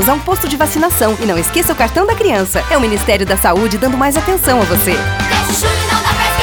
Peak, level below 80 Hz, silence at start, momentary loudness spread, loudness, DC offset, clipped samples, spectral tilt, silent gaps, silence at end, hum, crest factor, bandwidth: 0 dBFS; -26 dBFS; 0 s; 2 LU; -12 LUFS; under 0.1%; under 0.1%; -4 dB/octave; none; 0 s; none; 12 dB; over 20 kHz